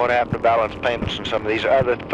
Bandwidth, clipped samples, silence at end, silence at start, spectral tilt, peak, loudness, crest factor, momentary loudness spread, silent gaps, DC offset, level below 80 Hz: 9.8 kHz; under 0.1%; 0 s; 0 s; -6 dB/octave; -8 dBFS; -20 LUFS; 12 dB; 5 LU; none; under 0.1%; -42 dBFS